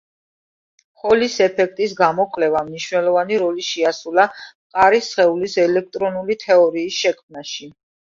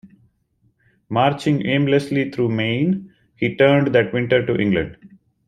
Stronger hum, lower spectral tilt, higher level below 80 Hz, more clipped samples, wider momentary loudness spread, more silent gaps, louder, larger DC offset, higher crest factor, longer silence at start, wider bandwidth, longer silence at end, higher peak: neither; second, -4 dB/octave vs -7.5 dB/octave; second, -60 dBFS vs -52 dBFS; neither; first, 12 LU vs 9 LU; first, 4.55-4.70 s, 7.23-7.29 s vs none; about the same, -18 LUFS vs -19 LUFS; neither; about the same, 18 dB vs 18 dB; first, 1.05 s vs 0.05 s; second, 7.6 kHz vs 11.5 kHz; about the same, 0.5 s vs 0.4 s; about the same, 0 dBFS vs -2 dBFS